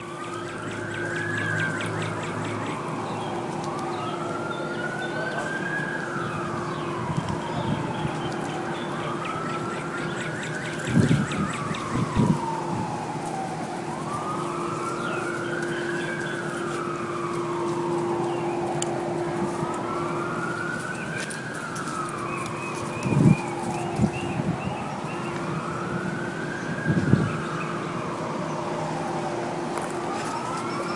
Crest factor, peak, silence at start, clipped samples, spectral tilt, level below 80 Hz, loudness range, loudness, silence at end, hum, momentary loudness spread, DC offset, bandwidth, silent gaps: 24 dB; -2 dBFS; 0 s; under 0.1%; -6 dB/octave; -54 dBFS; 3 LU; -28 LUFS; 0 s; none; 6 LU; under 0.1%; 11.5 kHz; none